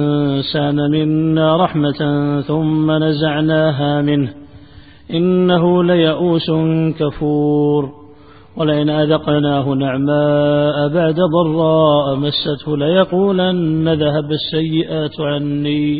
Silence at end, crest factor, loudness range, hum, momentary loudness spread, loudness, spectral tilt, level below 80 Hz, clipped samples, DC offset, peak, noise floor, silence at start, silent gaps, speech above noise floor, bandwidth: 0 s; 14 dB; 2 LU; none; 6 LU; -15 LUFS; -12.5 dB/octave; -48 dBFS; under 0.1%; 0.4%; 0 dBFS; -42 dBFS; 0 s; none; 28 dB; 4.9 kHz